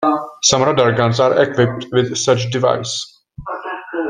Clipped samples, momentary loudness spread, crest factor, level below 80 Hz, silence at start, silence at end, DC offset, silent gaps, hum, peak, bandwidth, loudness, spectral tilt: under 0.1%; 13 LU; 16 dB; -50 dBFS; 0 s; 0 s; under 0.1%; none; none; 0 dBFS; 10 kHz; -16 LUFS; -4 dB/octave